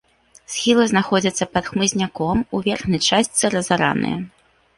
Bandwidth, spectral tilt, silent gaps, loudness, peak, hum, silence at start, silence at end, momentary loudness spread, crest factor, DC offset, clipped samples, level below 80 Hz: 11.5 kHz; -3.5 dB/octave; none; -19 LUFS; -2 dBFS; none; 0.5 s; 0.5 s; 6 LU; 18 dB; under 0.1%; under 0.1%; -48 dBFS